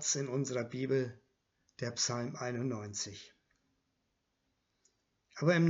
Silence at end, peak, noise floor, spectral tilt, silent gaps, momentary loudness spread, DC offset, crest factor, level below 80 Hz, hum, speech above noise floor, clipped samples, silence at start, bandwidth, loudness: 0 s; -16 dBFS; -81 dBFS; -4.5 dB/octave; none; 9 LU; under 0.1%; 20 dB; -78 dBFS; none; 47 dB; under 0.1%; 0 s; 8 kHz; -36 LUFS